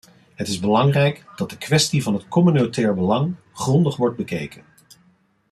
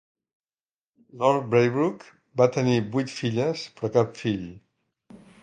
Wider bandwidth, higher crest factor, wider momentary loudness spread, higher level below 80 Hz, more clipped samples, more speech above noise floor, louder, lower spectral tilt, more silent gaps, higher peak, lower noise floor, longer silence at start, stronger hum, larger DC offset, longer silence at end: first, 13.5 kHz vs 9.4 kHz; about the same, 16 dB vs 20 dB; about the same, 12 LU vs 11 LU; about the same, -58 dBFS vs -62 dBFS; neither; second, 40 dB vs over 66 dB; first, -20 LUFS vs -25 LUFS; about the same, -5.5 dB/octave vs -6.5 dB/octave; neither; about the same, -4 dBFS vs -6 dBFS; second, -59 dBFS vs under -90 dBFS; second, 0.4 s vs 1.15 s; neither; neither; first, 1 s vs 0.25 s